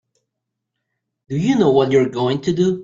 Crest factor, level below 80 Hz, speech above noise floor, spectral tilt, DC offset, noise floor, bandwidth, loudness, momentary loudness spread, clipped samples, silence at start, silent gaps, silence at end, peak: 16 dB; -56 dBFS; 63 dB; -7 dB/octave; under 0.1%; -79 dBFS; 7.6 kHz; -17 LUFS; 7 LU; under 0.1%; 1.3 s; none; 0 s; -2 dBFS